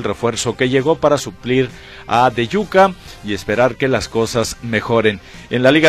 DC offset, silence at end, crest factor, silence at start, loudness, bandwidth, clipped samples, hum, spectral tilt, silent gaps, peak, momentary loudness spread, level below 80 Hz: under 0.1%; 0 s; 16 dB; 0 s; -17 LUFS; 14.5 kHz; under 0.1%; none; -5 dB/octave; none; 0 dBFS; 10 LU; -42 dBFS